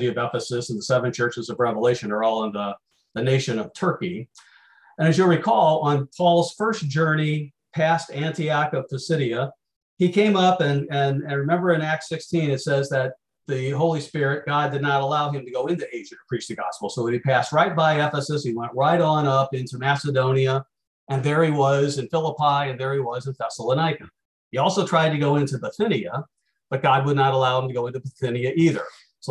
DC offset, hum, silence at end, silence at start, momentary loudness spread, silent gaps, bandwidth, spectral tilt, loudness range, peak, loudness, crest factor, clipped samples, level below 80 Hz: under 0.1%; none; 0 s; 0 s; 10 LU; 9.76-9.97 s, 20.87-21.07 s, 24.25-24.51 s; 11.5 kHz; -6 dB/octave; 3 LU; -6 dBFS; -22 LUFS; 16 dB; under 0.1%; -64 dBFS